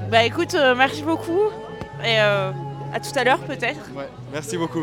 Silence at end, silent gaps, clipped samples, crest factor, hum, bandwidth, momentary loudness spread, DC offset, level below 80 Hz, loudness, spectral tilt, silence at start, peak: 0 s; none; under 0.1%; 20 dB; none; 17.5 kHz; 14 LU; under 0.1%; -54 dBFS; -21 LUFS; -4.5 dB/octave; 0 s; 0 dBFS